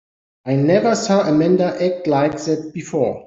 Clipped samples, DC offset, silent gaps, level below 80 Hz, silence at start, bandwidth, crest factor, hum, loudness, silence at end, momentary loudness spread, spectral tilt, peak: under 0.1%; under 0.1%; none; -58 dBFS; 0.45 s; 8 kHz; 14 dB; none; -18 LUFS; 0 s; 8 LU; -6.5 dB/octave; -4 dBFS